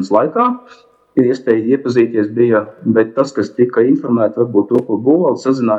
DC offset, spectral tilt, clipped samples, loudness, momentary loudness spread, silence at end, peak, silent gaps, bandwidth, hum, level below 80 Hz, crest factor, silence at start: under 0.1%; -8 dB/octave; under 0.1%; -14 LUFS; 3 LU; 0 s; 0 dBFS; none; 8 kHz; none; -60 dBFS; 14 dB; 0 s